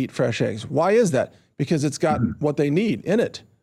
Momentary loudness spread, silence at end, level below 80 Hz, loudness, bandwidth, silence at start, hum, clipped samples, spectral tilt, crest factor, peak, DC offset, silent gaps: 7 LU; 0.25 s; -58 dBFS; -22 LUFS; 13.5 kHz; 0 s; none; under 0.1%; -6 dB/octave; 12 dB; -8 dBFS; under 0.1%; none